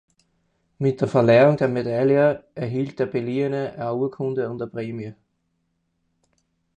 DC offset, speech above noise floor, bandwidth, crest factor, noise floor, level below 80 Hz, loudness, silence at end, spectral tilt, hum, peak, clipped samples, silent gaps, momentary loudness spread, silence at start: under 0.1%; 51 dB; 9 kHz; 18 dB; -72 dBFS; -62 dBFS; -22 LUFS; 1.65 s; -8.5 dB/octave; none; -4 dBFS; under 0.1%; none; 14 LU; 0.8 s